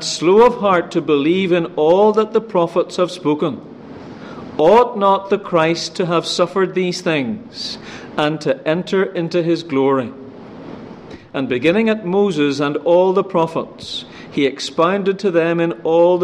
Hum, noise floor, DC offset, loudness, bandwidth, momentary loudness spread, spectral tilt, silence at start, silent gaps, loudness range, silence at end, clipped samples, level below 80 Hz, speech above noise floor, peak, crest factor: none; -36 dBFS; under 0.1%; -17 LUFS; 11 kHz; 18 LU; -5.5 dB/octave; 0 s; none; 3 LU; 0 s; under 0.1%; -56 dBFS; 20 dB; -2 dBFS; 14 dB